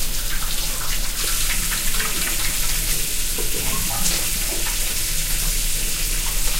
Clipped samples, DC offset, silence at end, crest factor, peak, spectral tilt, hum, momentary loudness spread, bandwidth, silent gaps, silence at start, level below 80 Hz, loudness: under 0.1%; under 0.1%; 0 s; 14 dB; -6 dBFS; -1 dB/octave; none; 3 LU; 16 kHz; none; 0 s; -26 dBFS; -21 LUFS